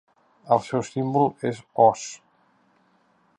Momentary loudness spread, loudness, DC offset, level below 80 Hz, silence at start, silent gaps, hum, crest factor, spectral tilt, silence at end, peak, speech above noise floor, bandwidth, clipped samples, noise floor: 14 LU; -23 LUFS; under 0.1%; -68 dBFS; 0.45 s; none; none; 22 dB; -6 dB/octave; 1.25 s; -4 dBFS; 41 dB; 11 kHz; under 0.1%; -63 dBFS